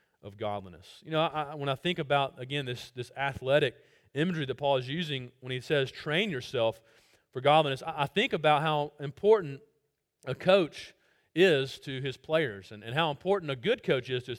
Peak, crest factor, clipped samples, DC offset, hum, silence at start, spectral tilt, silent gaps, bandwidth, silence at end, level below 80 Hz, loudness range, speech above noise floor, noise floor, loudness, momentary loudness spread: -10 dBFS; 20 dB; under 0.1%; under 0.1%; none; 0.25 s; -6 dB/octave; none; 16 kHz; 0 s; -66 dBFS; 3 LU; 48 dB; -78 dBFS; -29 LUFS; 14 LU